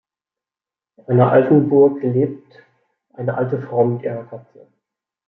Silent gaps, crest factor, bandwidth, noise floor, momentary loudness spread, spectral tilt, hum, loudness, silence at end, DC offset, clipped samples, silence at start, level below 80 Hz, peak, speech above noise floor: none; 16 dB; 4.1 kHz; under -90 dBFS; 18 LU; -12 dB/octave; none; -17 LUFS; 0.9 s; under 0.1%; under 0.1%; 1.1 s; -64 dBFS; -2 dBFS; over 73 dB